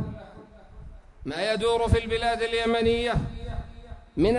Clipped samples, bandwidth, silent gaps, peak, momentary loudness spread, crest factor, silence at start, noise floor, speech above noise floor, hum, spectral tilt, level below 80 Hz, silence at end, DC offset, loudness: under 0.1%; 11 kHz; none; -6 dBFS; 19 LU; 20 dB; 0 s; -47 dBFS; 23 dB; none; -6 dB/octave; -38 dBFS; 0 s; under 0.1%; -26 LUFS